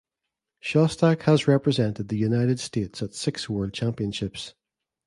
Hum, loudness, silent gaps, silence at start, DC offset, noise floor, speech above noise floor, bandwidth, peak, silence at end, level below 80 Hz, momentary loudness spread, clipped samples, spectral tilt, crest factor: none; -24 LUFS; none; 0.65 s; under 0.1%; -85 dBFS; 61 dB; 11.5 kHz; -6 dBFS; 0.55 s; -54 dBFS; 12 LU; under 0.1%; -6.5 dB/octave; 18 dB